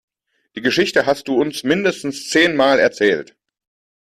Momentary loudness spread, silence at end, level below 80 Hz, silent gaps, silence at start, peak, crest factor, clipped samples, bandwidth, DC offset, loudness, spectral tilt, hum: 9 LU; 0.85 s; -58 dBFS; none; 0.55 s; -2 dBFS; 16 dB; under 0.1%; 14.5 kHz; under 0.1%; -17 LUFS; -4 dB/octave; none